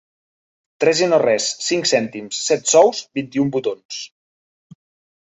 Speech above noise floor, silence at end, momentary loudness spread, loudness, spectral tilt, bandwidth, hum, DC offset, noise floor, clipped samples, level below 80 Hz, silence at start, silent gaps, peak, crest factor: over 72 dB; 1.15 s; 14 LU; -18 LUFS; -3 dB/octave; 8.4 kHz; none; under 0.1%; under -90 dBFS; under 0.1%; -64 dBFS; 0.8 s; 3.85-3.89 s; -2 dBFS; 18 dB